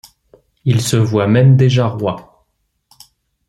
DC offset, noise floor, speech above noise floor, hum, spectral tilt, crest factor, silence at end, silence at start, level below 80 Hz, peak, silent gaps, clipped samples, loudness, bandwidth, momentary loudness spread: under 0.1%; -66 dBFS; 54 dB; none; -6.5 dB/octave; 14 dB; 1.25 s; 0.65 s; -50 dBFS; 0 dBFS; none; under 0.1%; -14 LUFS; 13 kHz; 12 LU